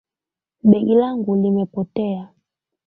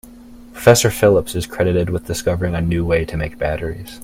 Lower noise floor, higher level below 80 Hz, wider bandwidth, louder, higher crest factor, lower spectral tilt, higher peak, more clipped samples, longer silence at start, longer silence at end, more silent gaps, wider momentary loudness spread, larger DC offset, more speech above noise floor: first, -89 dBFS vs -40 dBFS; second, -60 dBFS vs -36 dBFS; second, 4 kHz vs 16.5 kHz; about the same, -18 LUFS vs -17 LUFS; about the same, 18 dB vs 18 dB; first, -12.5 dB/octave vs -5 dB/octave; about the same, -2 dBFS vs 0 dBFS; neither; first, 0.65 s vs 0.05 s; first, 0.6 s vs 0 s; neither; about the same, 10 LU vs 11 LU; neither; first, 72 dB vs 23 dB